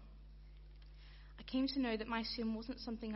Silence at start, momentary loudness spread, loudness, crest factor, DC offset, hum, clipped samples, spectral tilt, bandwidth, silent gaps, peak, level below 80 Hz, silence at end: 0 s; 22 LU; -40 LUFS; 16 dB; under 0.1%; 50 Hz at -55 dBFS; under 0.1%; -3.5 dB/octave; 6 kHz; none; -26 dBFS; -56 dBFS; 0 s